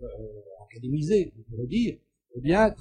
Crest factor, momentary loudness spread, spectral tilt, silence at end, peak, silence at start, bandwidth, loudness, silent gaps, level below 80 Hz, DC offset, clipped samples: 18 dB; 23 LU; -7 dB/octave; 0.05 s; -8 dBFS; 0 s; 9.8 kHz; -27 LUFS; none; -46 dBFS; under 0.1%; under 0.1%